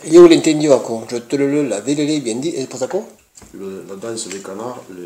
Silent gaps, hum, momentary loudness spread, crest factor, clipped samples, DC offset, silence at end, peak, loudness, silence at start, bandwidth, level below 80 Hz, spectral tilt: none; none; 20 LU; 16 dB; 0.4%; under 0.1%; 0 s; 0 dBFS; -16 LUFS; 0 s; 12 kHz; -58 dBFS; -5 dB/octave